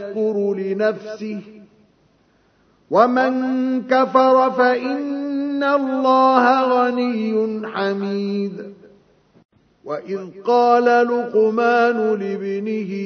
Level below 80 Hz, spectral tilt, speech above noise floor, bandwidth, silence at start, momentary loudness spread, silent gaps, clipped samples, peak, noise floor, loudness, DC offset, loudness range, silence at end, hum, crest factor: -70 dBFS; -6.5 dB/octave; 41 dB; 6.6 kHz; 0 s; 14 LU; 9.45-9.49 s; under 0.1%; 0 dBFS; -59 dBFS; -18 LUFS; under 0.1%; 7 LU; 0 s; none; 18 dB